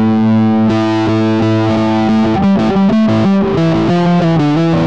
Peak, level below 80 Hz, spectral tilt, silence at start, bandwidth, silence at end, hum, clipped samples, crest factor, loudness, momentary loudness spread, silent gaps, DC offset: -4 dBFS; -38 dBFS; -8 dB/octave; 0 s; 7.8 kHz; 0 s; none; under 0.1%; 6 dB; -12 LUFS; 2 LU; none; 2%